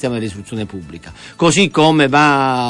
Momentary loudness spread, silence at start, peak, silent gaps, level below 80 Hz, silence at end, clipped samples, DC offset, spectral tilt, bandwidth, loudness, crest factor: 20 LU; 0 s; -2 dBFS; none; -48 dBFS; 0 s; under 0.1%; under 0.1%; -4.5 dB/octave; 11.5 kHz; -13 LUFS; 14 dB